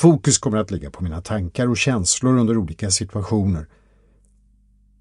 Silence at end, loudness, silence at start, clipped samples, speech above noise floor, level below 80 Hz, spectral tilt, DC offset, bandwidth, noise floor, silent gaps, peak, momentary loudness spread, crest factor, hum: 1.35 s; -20 LUFS; 0 s; under 0.1%; 36 dB; -42 dBFS; -4.5 dB/octave; under 0.1%; 11.5 kHz; -56 dBFS; none; -2 dBFS; 11 LU; 18 dB; 50 Hz at -45 dBFS